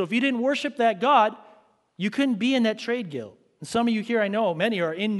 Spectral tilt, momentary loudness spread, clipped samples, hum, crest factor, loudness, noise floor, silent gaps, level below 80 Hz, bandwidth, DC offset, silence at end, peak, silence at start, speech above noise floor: -5 dB/octave; 11 LU; under 0.1%; none; 16 dB; -24 LUFS; -57 dBFS; none; -68 dBFS; 11.5 kHz; under 0.1%; 0 s; -8 dBFS; 0 s; 34 dB